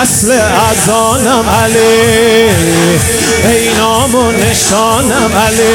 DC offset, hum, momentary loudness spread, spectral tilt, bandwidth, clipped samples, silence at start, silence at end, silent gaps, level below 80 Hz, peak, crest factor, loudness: under 0.1%; none; 2 LU; -3.5 dB/octave; 18 kHz; 0.2%; 0 s; 0 s; none; -32 dBFS; 0 dBFS; 8 dB; -8 LUFS